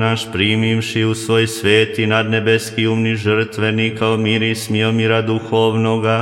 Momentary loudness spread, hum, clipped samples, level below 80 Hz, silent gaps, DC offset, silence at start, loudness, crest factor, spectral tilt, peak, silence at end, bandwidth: 4 LU; none; under 0.1%; -56 dBFS; none; under 0.1%; 0 s; -16 LUFS; 16 dB; -5.5 dB/octave; 0 dBFS; 0 s; 16 kHz